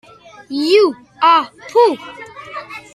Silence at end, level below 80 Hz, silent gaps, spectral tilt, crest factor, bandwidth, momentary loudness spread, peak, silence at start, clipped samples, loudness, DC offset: 0.15 s; -64 dBFS; none; -3.5 dB/octave; 16 dB; 13 kHz; 18 LU; -2 dBFS; 0.5 s; under 0.1%; -14 LUFS; under 0.1%